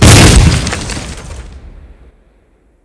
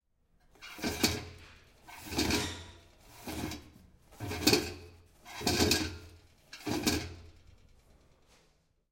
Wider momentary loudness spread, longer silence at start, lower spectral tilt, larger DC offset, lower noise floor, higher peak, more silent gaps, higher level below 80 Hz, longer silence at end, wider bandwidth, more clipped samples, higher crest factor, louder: about the same, 25 LU vs 23 LU; second, 0 s vs 0.6 s; about the same, -4 dB/octave vs -3 dB/octave; neither; second, -50 dBFS vs -70 dBFS; first, 0 dBFS vs -10 dBFS; neither; first, -16 dBFS vs -54 dBFS; second, 1.15 s vs 1.6 s; second, 11 kHz vs 16.5 kHz; first, 6% vs under 0.1%; second, 10 dB vs 26 dB; first, -8 LUFS vs -32 LUFS